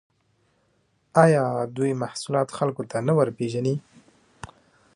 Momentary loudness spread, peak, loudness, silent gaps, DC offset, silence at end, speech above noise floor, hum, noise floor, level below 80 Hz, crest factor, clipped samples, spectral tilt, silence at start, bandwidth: 22 LU; -2 dBFS; -24 LUFS; none; under 0.1%; 1.15 s; 45 dB; none; -67 dBFS; -64 dBFS; 24 dB; under 0.1%; -6.5 dB/octave; 1.15 s; 11.5 kHz